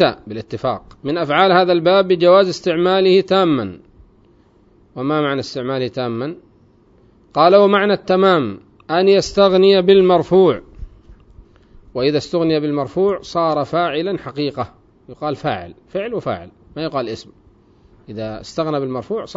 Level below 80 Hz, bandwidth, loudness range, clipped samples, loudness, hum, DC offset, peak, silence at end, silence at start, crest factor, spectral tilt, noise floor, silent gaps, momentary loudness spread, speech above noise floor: -48 dBFS; 7.8 kHz; 11 LU; under 0.1%; -16 LUFS; none; under 0.1%; 0 dBFS; 0.05 s; 0 s; 18 dB; -6 dB/octave; -52 dBFS; none; 16 LU; 36 dB